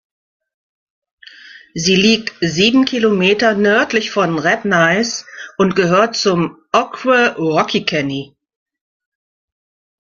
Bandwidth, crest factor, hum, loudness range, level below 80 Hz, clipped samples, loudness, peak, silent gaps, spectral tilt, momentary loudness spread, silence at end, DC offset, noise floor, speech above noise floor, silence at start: 7.4 kHz; 16 dB; none; 4 LU; -54 dBFS; under 0.1%; -14 LUFS; 0 dBFS; none; -4.5 dB/octave; 7 LU; 1.85 s; under 0.1%; -40 dBFS; 25 dB; 1.55 s